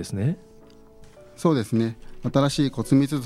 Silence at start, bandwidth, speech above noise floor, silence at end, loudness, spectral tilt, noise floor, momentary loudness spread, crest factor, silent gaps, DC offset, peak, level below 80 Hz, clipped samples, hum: 0 s; 14 kHz; 26 dB; 0 s; -24 LUFS; -6.5 dB/octave; -49 dBFS; 8 LU; 18 dB; none; under 0.1%; -6 dBFS; -50 dBFS; under 0.1%; none